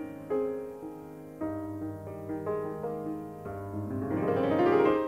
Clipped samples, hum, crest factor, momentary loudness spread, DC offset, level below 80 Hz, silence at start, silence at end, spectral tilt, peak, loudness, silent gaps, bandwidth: under 0.1%; none; 18 dB; 15 LU; under 0.1%; -62 dBFS; 0 s; 0 s; -8.5 dB/octave; -12 dBFS; -32 LUFS; none; 16 kHz